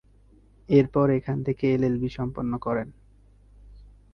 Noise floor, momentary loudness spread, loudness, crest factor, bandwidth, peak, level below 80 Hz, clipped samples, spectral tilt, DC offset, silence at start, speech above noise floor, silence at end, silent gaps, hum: -56 dBFS; 9 LU; -25 LUFS; 20 dB; 6.4 kHz; -6 dBFS; -50 dBFS; under 0.1%; -9.5 dB/octave; under 0.1%; 0.7 s; 32 dB; 0.3 s; none; 50 Hz at -50 dBFS